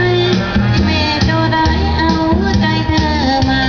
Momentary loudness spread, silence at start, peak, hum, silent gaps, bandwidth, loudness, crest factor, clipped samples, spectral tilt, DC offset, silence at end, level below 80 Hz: 1 LU; 0 s; 0 dBFS; none; none; 5.4 kHz; -13 LUFS; 12 dB; under 0.1%; -6 dB/octave; 0.2%; 0 s; -22 dBFS